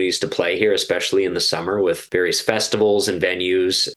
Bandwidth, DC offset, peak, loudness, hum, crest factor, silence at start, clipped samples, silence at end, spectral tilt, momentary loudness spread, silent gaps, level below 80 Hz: 12.5 kHz; under 0.1%; 0 dBFS; -19 LUFS; none; 20 dB; 0 s; under 0.1%; 0 s; -3 dB/octave; 3 LU; none; -56 dBFS